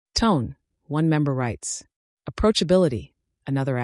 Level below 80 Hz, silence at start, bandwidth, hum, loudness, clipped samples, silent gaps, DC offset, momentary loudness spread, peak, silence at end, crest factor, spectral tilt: -42 dBFS; 0.15 s; 11.5 kHz; none; -23 LUFS; under 0.1%; 1.96-2.17 s; under 0.1%; 15 LU; -8 dBFS; 0 s; 16 dB; -5.5 dB/octave